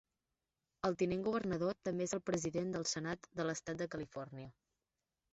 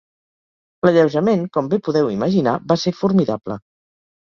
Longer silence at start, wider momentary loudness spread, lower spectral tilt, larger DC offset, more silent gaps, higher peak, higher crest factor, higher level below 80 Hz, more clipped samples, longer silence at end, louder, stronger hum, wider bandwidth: about the same, 0.85 s vs 0.85 s; about the same, 10 LU vs 8 LU; second, -5 dB/octave vs -7 dB/octave; neither; neither; second, -20 dBFS vs -2 dBFS; about the same, 20 dB vs 18 dB; second, -68 dBFS vs -56 dBFS; neither; about the same, 0.8 s vs 0.75 s; second, -39 LUFS vs -18 LUFS; neither; first, 8 kHz vs 7.2 kHz